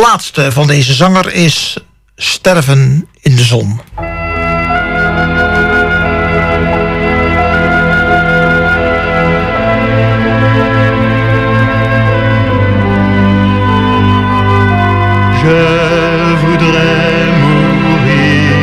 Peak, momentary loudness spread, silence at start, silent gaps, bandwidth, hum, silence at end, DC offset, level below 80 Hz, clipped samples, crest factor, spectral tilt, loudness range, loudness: 0 dBFS; 4 LU; 0 s; none; 15 kHz; none; 0 s; under 0.1%; -26 dBFS; under 0.1%; 10 dB; -6 dB/octave; 2 LU; -9 LUFS